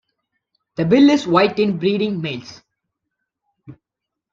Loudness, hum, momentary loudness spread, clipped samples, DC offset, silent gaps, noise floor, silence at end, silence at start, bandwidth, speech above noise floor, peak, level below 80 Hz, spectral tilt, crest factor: -17 LUFS; none; 15 LU; under 0.1%; under 0.1%; none; -83 dBFS; 0.6 s; 0.8 s; 7.6 kHz; 67 dB; -2 dBFS; -60 dBFS; -6.5 dB/octave; 18 dB